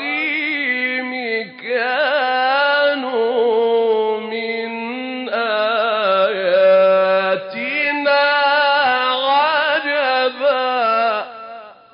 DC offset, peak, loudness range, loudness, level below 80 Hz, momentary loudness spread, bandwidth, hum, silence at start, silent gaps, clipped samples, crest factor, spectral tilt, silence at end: under 0.1%; -4 dBFS; 3 LU; -17 LUFS; -70 dBFS; 9 LU; 5.4 kHz; none; 0 s; none; under 0.1%; 12 dB; -8 dB/octave; 0.2 s